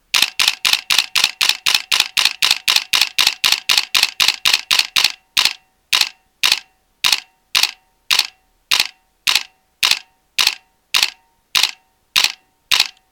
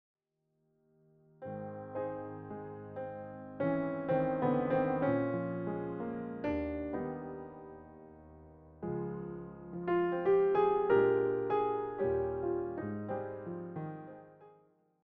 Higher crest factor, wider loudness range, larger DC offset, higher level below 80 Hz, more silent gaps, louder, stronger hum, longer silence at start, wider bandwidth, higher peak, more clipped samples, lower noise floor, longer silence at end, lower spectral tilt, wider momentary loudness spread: about the same, 18 dB vs 18 dB; second, 4 LU vs 10 LU; neither; first, -56 dBFS vs -62 dBFS; neither; first, -15 LUFS vs -35 LUFS; neither; second, 0.15 s vs 1.4 s; first, over 20 kHz vs 4.5 kHz; first, 0 dBFS vs -18 dBFS; neither; second, -36 dBFS vs -81 dBFS; second, 0.2 s vs 0.55 s; second, 2.5 dB/octave vs -7.5 dB/octave; second, 6 LU vs 18 LU